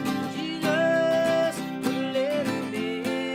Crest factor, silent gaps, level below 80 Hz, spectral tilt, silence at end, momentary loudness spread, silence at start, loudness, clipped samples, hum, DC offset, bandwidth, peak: 14 dB; none; -66 dBFS; -5 dB/octave; 0 s; 7 LU; 0 s; -26 LUFS; under 0.1%; none; under 0.1%; 16.5 kHz; -10 dBFS